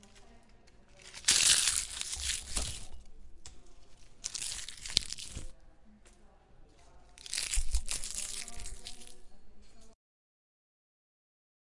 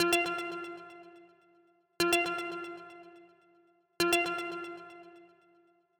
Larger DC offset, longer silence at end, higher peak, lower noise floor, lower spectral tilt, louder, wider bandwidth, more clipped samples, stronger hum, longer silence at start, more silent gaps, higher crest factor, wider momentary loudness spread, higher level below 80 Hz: neither; first, 1.8 s vs 0.75 s; first, -2 dBFS vs -14 dBFS; second, -58 dBFS vs -67 dBFS; second, 0.5 dB/octave vs -2.5 dB/octave; about the same, -31 LUFS vs -32 LUFS; second, 11.5 kHz vs 19 kHz; neither; neither; about the same, 0.05 s vs 0 s; neither; first, 36 dB vs 22 dB; about the same, 24 LU vs 23 LU; first, -46 dBFS vs -72 dBFS